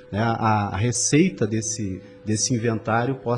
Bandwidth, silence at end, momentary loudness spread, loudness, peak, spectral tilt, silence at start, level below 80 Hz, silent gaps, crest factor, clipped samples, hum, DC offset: 11 kHz; 0 s; 9 LU; -22 LUFS; -8 dBFS; -4.5 dB/octave; 0 s; -54 dBFS; none; 16 dB; under 0.1%; none; under 0.1%